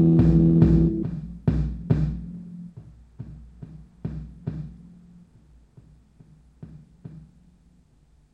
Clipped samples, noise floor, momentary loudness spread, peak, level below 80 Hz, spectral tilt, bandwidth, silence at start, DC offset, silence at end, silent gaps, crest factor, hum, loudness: under 0.1%; -58 dBFS; 28 LU; -4 dBFS; -36 dBFS; -11.5 dB/octave; 4.2 kHz; 0 s; under 0.1%; 1.15 s; none; 22 dB; none; -23 LUFS